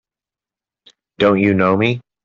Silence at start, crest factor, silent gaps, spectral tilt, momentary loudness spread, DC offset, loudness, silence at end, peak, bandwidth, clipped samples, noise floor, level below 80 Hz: 1.2 s; 16 dB; none; -8 dB/octave; 4 LU; under 0.1%; -15 LUFS; 0.25 s; -2 dBFS; 7 kHz; under 0.1%; -89 dBFS; -56 dBFS